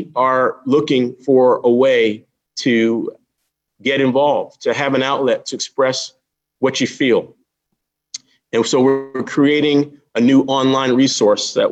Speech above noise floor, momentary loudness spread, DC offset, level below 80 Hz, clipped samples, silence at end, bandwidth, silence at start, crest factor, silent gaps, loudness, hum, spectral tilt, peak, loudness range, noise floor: 59 dB; 10 LU; under 0.1%; -66 dBFS; under 0.1%; 0 s; 8.6 kHz; 0 s; 14 dB; none; -16 LUFS; none; -4.5 dB/octave; -2 dBFS; 4 LU; -75 dBFS